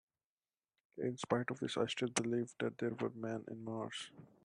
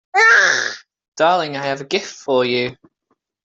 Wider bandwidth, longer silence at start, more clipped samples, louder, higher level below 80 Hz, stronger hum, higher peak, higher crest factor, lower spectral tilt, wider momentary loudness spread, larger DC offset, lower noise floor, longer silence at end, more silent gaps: first, 10.5 kHz vs 8 kHz; first, 0.95 s vs 0.15 s; neither; second, -40 LUFS vs -16 LUFS; second, -80 dBFS vs -64 dBFS; neither; second, -20 dBFS vs -2 dBFS; first, 22 dB vs 16 dB; first, -4.5 dB/octave vs -2.5 dB/octave; second, 8 LU vs 14 LU; neither; first, under -90 dBFS vs -69 dBFS; second, 0.2 s vs 0.7 s; second, none vs 1.08-1.12 s